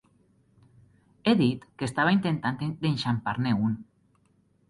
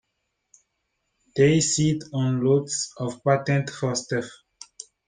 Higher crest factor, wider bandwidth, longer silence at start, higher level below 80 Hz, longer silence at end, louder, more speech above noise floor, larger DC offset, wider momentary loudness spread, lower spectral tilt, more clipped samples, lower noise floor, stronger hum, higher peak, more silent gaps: about the same, 18 dB vs 18 dB; first, 11.5 kHz vs 10 kHz; about the same, 1.25 s vs 1.35 s; about the same, -60 dBFS vs -60 dBFS; first, 0.85 s vs 0.25 s; second, -27 LUFS vs -23 LUFS; second, 40 dB vs 55 dB; neither; second, 7 LU vs 12 LU; first, -7 dB/octave vs -5 dB/octave; neither; second, -66 dBFS vs -77 dBFS; neither; second, -10 dBFS vs -6 dBFS; neither